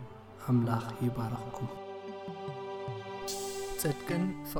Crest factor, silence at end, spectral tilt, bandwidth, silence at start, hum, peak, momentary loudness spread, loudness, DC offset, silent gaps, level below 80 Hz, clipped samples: 18 dB; 0 s; -6 dB/octave; over 20 kHz; 0 s; none; -18 dBFS; 12 LU; -35 LUFS; under 0.1%; none; -56 dBFS; under 0.1%